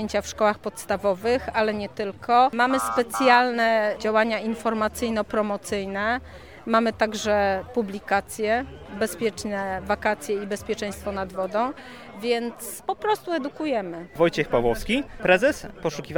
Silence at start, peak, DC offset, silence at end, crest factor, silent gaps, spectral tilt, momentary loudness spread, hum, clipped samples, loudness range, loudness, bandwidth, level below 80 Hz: 0 s; -4 dBFS; 0.2%; 0 s; 20 dB; none; -4.5 dB/octave; 10 LU; none; under 0.1%; 6 LU; -24 LUFS; 19.5 kHz; -48 dBFS